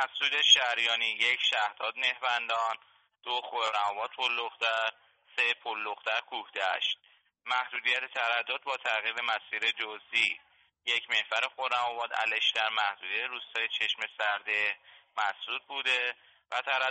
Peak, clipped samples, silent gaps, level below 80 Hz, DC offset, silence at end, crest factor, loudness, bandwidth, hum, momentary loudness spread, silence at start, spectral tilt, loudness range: -8 dBFS; under 0.1%; none; -86 dBFS; under 0.1%; 0 s; 24 dB; -29 LUFS; 8.4 kHz; none; 8 LU; 0 s; 1.5 dB/octave; 2 LU